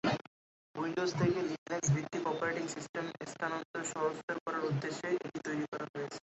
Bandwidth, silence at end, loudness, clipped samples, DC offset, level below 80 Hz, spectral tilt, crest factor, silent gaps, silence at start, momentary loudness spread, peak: 8 kHz; 0.1 s; -36 LUFS; under 0.1%; under 0.1%; -68 dBFS; -5.5 dB/octave; 16 dB; 0.27-0.74 s, 1.58-1.66 s, 2.89-2.94 s, 3.65-3.74 s, 4.23-4.28 s, 4.40-4.46 s, 5.68-5.72 s, 5.89-5.94 s; 0.05 s; 8 LU; -20 dBFS